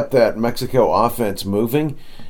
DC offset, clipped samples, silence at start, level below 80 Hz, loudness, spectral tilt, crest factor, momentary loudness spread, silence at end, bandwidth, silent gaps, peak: under 0.1%; under 0.1%; 0 s; -38 dBFS; -18 LUFS; -6 dB/octave; 16 dB; 6 LU; 0 s; 19 kHz; none; -2 dBFS